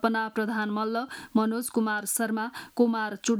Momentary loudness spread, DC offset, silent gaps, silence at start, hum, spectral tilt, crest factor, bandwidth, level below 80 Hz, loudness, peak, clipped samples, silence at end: 5 LU; under 0.1%; none; 0 s; none; -4 dB/octave; 16 dB; 18 kHz; -72 dBFS; -28 LUFS; -10 dBFS; under 0.1%; 0 s